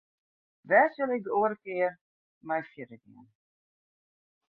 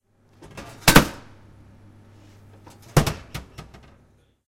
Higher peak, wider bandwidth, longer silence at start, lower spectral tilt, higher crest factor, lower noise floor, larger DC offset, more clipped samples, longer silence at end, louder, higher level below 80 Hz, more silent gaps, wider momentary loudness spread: second, -10 dBFS vs 0 dBFS; second, 4.5 kHz vs 16.5 kHz; about the same, 0.65 s vs 0.55 s; first, -9 dB/octave vs -4 dB/octave; about the same, 22 dB vs 26 dB; first, under -90 dBFS vs -59 dBFS; neither; neither; first, 1.55 s vs 0.85 s; second, -28 LUFS vs -19 LUFS; second, -78 dBFS vs -36 dBFS; first, 2.01-2.41 s vs none; second, 20 LU vs 28 LU